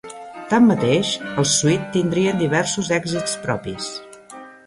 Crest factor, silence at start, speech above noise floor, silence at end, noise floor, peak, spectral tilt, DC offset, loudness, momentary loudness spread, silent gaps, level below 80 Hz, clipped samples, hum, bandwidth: 16 dB; 0.05 s; 21 dB; 0.15 s; -40 dBFS; -4 dBFS; -4.5 dB/octave; under 0.1%; -19 LUFS; 20 LU; none; -54 dBFS; under 0.1%; none; 11.5 kHz